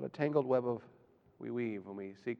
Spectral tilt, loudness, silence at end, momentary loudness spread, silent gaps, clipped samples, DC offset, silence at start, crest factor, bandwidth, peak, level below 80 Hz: -9 dB/octave; -36 LUFS; 0.05 s; 13 LU; none; under 0.1%; under 0.1%; 0 s; 20 dB; 6.8 kHz; -18 dBFS; -82 dBFS